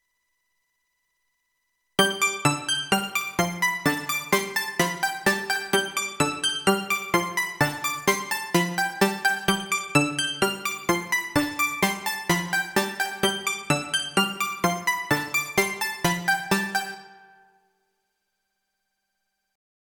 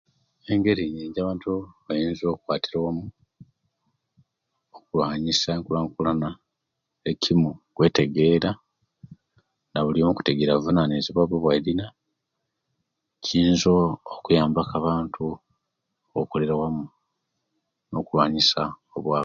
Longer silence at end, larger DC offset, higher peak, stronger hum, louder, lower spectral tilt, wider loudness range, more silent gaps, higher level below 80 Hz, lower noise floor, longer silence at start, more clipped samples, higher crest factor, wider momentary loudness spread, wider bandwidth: first, 2.8 s vs 0 s; neither; about the same, -4 dBFS vs -6 dBFS; neither; about the same, -24 LUFS vs -24 LUFS; second, -3 dB/octave vs -6 dB/octave; second, 3 LU vs 6 LU; neither; second, -60 dBFS vs -50 dBFS; about the same, -78 dBFS vs -81 dBFS; first, 2 s vs 0.5 s; neither; about the same, 22 dB vs 20 dB; second, 4 LU vs 12 LU; first, over 20 kHz vs 7.4 kHz